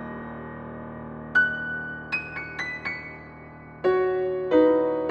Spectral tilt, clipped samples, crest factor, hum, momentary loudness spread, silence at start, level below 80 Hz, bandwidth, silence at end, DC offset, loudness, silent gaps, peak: -7 dB/octave; under 0.1%; 18 dB; none; 18 LU; 0 s; -54 dBFS; 6.6 kHz; 0 s; under 0.1%; -25 LUFS; none; -8 dBFS